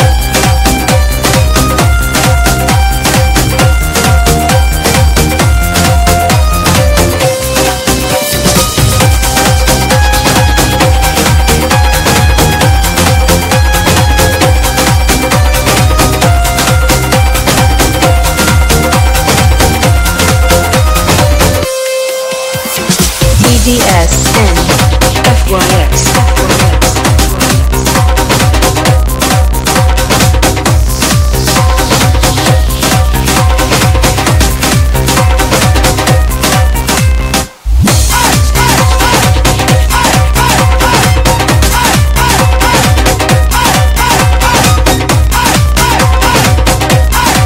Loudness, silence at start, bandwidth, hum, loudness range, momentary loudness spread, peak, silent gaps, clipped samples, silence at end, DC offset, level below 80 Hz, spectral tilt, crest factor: -8 LUFS; 0 s; 17 kHz; none; 1 LU; 2 LU; 0 dBFS; none; 1%; 0 s; under 0.1%; -12 dBFS; -4 dB/octave; 8 dB